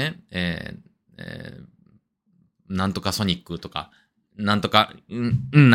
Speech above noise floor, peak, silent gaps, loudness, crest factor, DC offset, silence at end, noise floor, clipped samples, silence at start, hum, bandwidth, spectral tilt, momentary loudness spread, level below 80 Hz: 42 dB; 0 dBFS; none; -24 LUFS; 24 dB; under 0.1%; 0 s; -64 dBFS; under 0.1%; 0 s; none; 16.5 kHz; -6 dB/octave; 19 LU; -54 dBFS